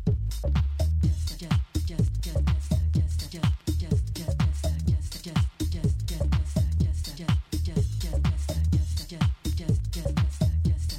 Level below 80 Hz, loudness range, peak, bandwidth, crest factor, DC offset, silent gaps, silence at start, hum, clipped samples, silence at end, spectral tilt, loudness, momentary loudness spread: -30 dBFS; 1 LU; -12 dBFS; 15.5 kHz; 14 dB; under 0.1%; none; 0 s; none; under 0.1%; 0 s; -6.5 dB/octave; -28 LUFS; 4 LU